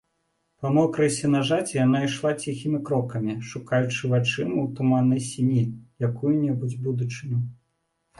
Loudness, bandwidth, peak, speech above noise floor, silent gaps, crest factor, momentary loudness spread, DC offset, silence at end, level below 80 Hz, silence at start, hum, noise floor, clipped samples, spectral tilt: -25 LUFS; 11.5 kHz; -8 dBFS; 51 dB; none; 16 dB; 8 LU; under 0.1%; 0.65 s; -62 dBFS; 0.6 s; none; -74 dBFS; under 0.1%; -6.5 dB/octave